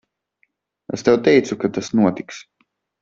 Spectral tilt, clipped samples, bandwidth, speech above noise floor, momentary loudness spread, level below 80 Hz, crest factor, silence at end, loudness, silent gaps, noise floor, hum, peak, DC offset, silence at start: -6 dB/octave; under 0.1%; 7.8 kHz; 49 dB; 18 LU; -60 dBFS; 18 dB; 0.6 s; -18 LUFS; none; -67 dBFS; none; -2 dBFS; under 0.1%; 0.9 s